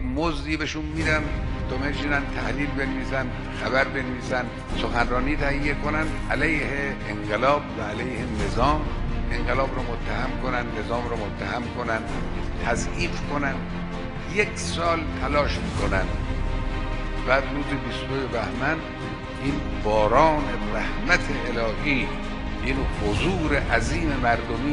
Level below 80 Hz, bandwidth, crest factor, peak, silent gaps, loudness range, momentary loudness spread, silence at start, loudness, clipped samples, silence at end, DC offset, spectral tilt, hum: -30 dBFS; 11 kHz; 20 dB; -4 dBFS; none; 4 LU; 7 LU; 0 s; -25 LUFS; under 0.1%; 0 s; under 0.1%; -5.5 dB/octave; none